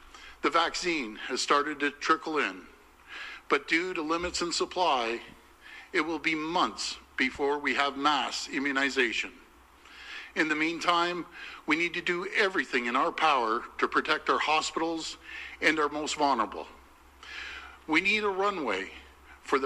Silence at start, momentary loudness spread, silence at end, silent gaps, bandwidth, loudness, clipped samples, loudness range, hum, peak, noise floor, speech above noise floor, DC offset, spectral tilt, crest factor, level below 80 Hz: 0.05 s; 15 LU; 0 s; none; 13.5 kHz; -28 LUFS; under 0.1%; 3 LU; none; -8 dBFS; -55 dBFS; 27 dB; under 0.1%; -2.5 dB/octave; 22 dB; -60 dBFS